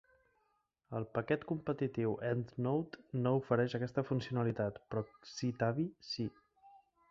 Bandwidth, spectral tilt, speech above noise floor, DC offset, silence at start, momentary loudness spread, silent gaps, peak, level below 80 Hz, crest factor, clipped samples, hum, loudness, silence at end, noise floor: 7.6 kHz; -6.5 dB/octave; 43 dB; under 0.1%; 0.9 s; 8 LU; none; -18 dBFS; -70 dBFS; 20 dB; under 0.1%; none; -37 LUFS; 0.35 s; -80 dBFS